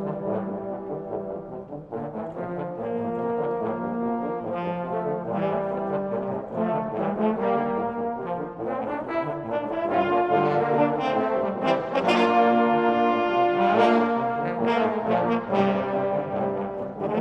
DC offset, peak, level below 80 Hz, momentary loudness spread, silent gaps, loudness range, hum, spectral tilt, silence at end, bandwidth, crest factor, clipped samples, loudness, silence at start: under 0.1%; -8 dBFS; -60 dBFS; 11 LU; none; 8 LU; none; -7.5 dB/octave; 0 s; 8.6 kHz; 18 dB; under 0.1%; -25 LUFS; 0 s